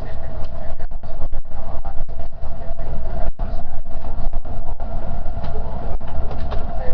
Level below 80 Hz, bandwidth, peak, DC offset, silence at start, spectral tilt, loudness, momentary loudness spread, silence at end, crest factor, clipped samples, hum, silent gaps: -22 dBFS; 2 kHz; -2 dBFS; under 0.1%; 0 s; -9 dB/octave; -31 LUFS; 5 LU; 0 s; 10 dB; under 0.1%; none; none